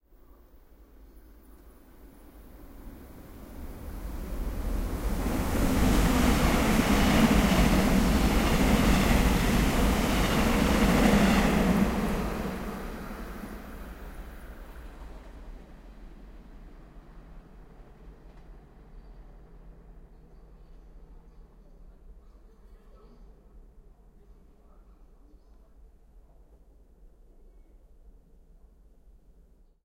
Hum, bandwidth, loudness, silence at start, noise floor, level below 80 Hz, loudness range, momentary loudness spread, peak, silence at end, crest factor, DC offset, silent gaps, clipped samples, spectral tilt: none; 16 kHz; -26 LUFS; 1.15 s; -58 dBFS; -34 dBFS; 24 LU; 25 LU; -8 dBFS; 6.05 s; 20 dB; under 0.1%; none; under 0.1%; -5.5 dB/octave